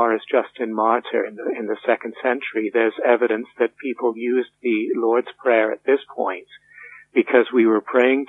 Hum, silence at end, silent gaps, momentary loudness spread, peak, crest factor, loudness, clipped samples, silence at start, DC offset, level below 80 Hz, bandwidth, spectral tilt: none; 0.05 s; none; 8 LU; -2 dBFS; 18 dB; -21 LUFS; under 0.1%; 0 s; under 0.1%; -78 dBFS; 3.9 kHz; -7 dB/octave